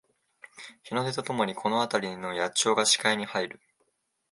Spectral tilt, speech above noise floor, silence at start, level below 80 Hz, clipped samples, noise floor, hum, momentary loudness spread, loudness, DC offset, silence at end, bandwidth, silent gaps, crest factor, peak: -2.5 dB/octave; 47 dB; 0.55 s; -74 dBFS; under 0.1%; -75 dBFS; none; 14 LU; -27 LUFS; under 0.1%; 0.8 s; 11.5 kHz; none; 22 dB; -8 dBFS